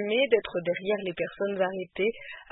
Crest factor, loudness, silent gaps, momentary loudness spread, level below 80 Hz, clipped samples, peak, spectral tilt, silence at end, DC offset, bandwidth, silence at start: 20 dB; -28 LUFS; none; 7 LU; -64 dBFS; under 0.1%; -10 dBFS; -9 dB/octave; 0.1 s; under 0.1%; 4.1 kHz; 0 s